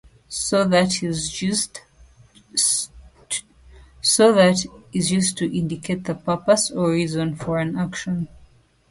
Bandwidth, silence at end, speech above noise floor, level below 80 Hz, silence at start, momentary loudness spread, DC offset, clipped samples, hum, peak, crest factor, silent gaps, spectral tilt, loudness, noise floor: 11.5 kHz; 0.45 s; 33 dB; -52 dBFS; 0.3 s; 12 LU; under 0.1%; under 0.1%; none; -2 dBFS; 20 dB; none; -4 dB/octave; -21 LUFS; -53 dBFS